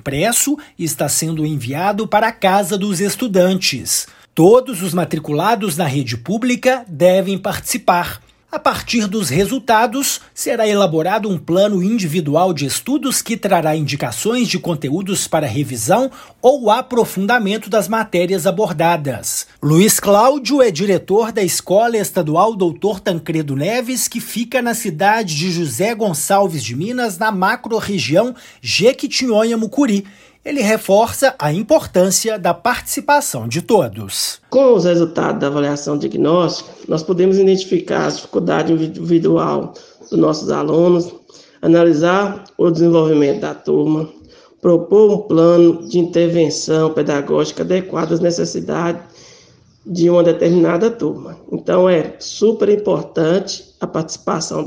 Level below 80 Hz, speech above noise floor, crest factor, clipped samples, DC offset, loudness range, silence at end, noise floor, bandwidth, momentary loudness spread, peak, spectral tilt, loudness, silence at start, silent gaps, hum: -54 dBFS; 33 dB; 16 dB; under 0.1%; under 0.1%; 3 LU; 0 s; -48 dBFS; 16.5 kHz; 8 LU; 0 dBFS; -4.5 dB/octave; -16 LUFS; 0.05 s; none; none